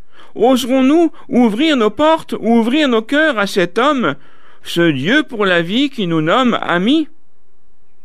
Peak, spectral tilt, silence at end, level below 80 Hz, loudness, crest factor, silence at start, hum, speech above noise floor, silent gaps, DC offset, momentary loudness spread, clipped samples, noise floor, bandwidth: -2 dBFS; -5.5 dB/octave; 1 s; -54 dBFS; -14 LUFS; 14 dB; 0.35 s; none; 46 dB; none; 3%; 5 LU; under 0.1%; -60 dBFS; 14.5 kHz